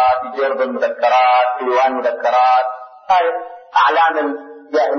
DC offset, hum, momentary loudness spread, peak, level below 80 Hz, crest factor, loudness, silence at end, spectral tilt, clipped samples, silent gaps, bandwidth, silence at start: under 0.1%; none; 10 LU; -4 dBFS; -60 dBFS; 12 dB; -15 LUFS; 0 s; -3 dB/octave; under 0.1%; none; 6.6 kHz; 0 s